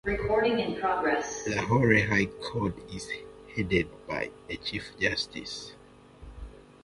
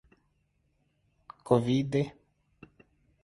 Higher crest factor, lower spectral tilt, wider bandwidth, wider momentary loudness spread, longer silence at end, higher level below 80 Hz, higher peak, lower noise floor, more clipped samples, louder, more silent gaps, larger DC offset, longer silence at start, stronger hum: about the same, 22 dB vs 26 dB; second, -5 dB/octave vs -7.5 dB/octave; about the same, 11.5 kHz vs 11.5 kHz; first, 17 LU vs 13 LU; second, 0.2 s vs 1.15 s; first, -48 dBFS vs -64 dBFS; about the same, -8 dBFS vs -8 dBFS; second, -51 dBFS vs -73 dBFS; neither; about the same, -29 LUFS vs -29 LUFS; neither; neither; second, 0.05 s vs 1.45 s; neither